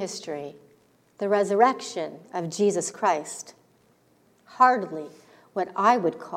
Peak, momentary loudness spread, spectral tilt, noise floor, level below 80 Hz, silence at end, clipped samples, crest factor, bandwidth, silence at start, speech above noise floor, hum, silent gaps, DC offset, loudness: -4 dBFS; 17 LU; -4 dB/octave; -62 dBFS; -80 dBFS; 0 s; under 0.1%; 22 dB; 15 kHz; 0 s; 38 dB; none; none; under 0.1%; -25 LUFS